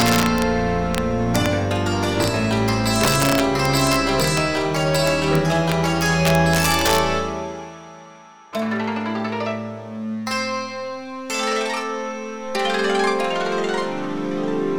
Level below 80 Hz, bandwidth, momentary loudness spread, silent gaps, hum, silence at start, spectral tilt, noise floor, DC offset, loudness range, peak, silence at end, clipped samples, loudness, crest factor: -40 dBFS; over 20 kHz; 12 LU; none; none; 0 s; -4.5 dB/octave; -44 dBFS; 1%; 8 LU; -4 dBFS; 0 s; under 0.1%; -20 LUFS; 16 dB